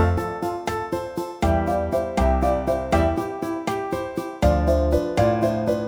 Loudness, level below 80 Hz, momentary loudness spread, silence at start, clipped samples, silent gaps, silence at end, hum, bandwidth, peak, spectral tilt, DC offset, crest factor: -23 LUFS; -30 dBFS; 7 LU; 0 s; under 0.1%; none; 0 s; none; over 20 kHz; -6 dBFS; -7 dB/octave; under 0.1%; 16 dB